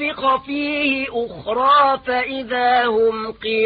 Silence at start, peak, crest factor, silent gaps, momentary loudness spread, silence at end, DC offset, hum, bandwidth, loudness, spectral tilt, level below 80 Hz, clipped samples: 0 s; -4 dBFS; 14 dB; none; 9 LU; 0 s; under 0.1%; none; 5 kHz; -18 LUFS; -9 dB/octave; -52 dBFS; under 0.1%